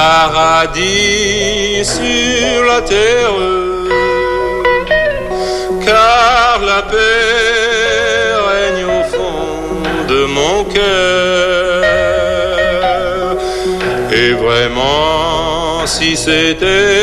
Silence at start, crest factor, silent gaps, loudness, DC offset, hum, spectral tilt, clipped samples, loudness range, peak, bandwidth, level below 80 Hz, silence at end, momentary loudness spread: 0 s; 12 dB; none; -11 LUFS; under 0.1%; none; -3 dB/octave; under 0.1%; 3 LU; 0 dBFS; 13.5 kHz; -30 dBFS; 0 s; 6 LU